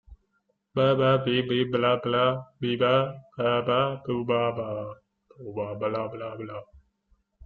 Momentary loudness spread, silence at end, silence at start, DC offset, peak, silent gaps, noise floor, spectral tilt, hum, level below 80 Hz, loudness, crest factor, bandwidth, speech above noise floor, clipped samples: 14 LU; 0 s; 0.1 s; under 0.1%; -8 dBFS; none; -73 dBFS; -8.5 dB/octave; none; -60 dBFS; -26 LUFS; 18 dB; 4.8 kHz; 48 dB; under 0.1%